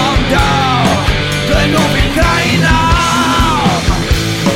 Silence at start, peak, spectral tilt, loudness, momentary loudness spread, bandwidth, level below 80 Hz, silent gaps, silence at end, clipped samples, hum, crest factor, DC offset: 0 s; 0 dBFS; -4.5 dB/octave; -11 LUFS; 3 LU; 16.5 kHz; -20 dBFS; none; 0 s; under 0.1%; none; 10 dB; 0.4%